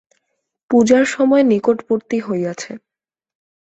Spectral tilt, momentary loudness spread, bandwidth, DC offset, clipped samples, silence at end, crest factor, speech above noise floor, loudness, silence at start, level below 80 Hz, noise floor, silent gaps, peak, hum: -5.5 dB/octave; 15 LU; 8.2 kHz; under 0.1%; under 0.1%; 1 s; 16 dB; 73 dB; -16 LUFS; 0.7 s; -60 dBFS; -89 dBFS; none; -2 dBFS; none